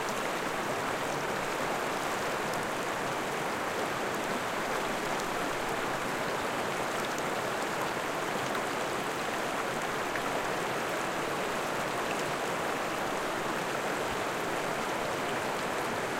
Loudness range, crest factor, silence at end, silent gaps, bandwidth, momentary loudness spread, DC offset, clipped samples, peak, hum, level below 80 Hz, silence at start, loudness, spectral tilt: 0 LU; 14 dB; 0 s; none; 16.5 kHz; 1 LU; under 0.1%; under 0.1%; -18 dBFS; none; -58 dBFS; 0 s; -32 LUFS; -3 dB/octave